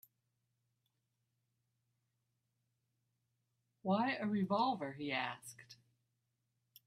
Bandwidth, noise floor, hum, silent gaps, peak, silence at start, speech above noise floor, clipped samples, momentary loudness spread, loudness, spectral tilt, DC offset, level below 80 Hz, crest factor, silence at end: 13.5 kHz; -85 dBFS; none; none; -24 dBFS; 3.85 s; 48 dB; under 0.1%; 16 LU; -38 LUFS; -5.5 dB/octave; under 0.1%; -84 dBFS; 20 dB; 1.15 s